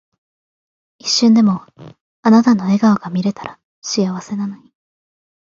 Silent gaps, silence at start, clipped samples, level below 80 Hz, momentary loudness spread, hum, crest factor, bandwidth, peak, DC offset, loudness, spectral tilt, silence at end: 2.01-2.23 s, 3.64-3.82 s; 1.05 s; under 0.1%; -62 dBFS; 15 LU; none; 16 dB; 7.6 kHz; -2 dBFS; under 0.1%; -15 LUFS; -5 dB/octave; 0.95 s